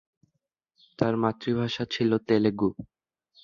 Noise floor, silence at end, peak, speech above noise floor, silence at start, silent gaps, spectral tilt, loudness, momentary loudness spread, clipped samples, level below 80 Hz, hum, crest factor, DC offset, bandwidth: -79 dBFS; 0.6 s; -6 dBFS; 54 dB; 1 s; none; -7 dB/octave; -26 LUFS; 6 LU; under 0.1%; -60 dBFS; none; 22 dB; under 0.1%; 7.2 kHz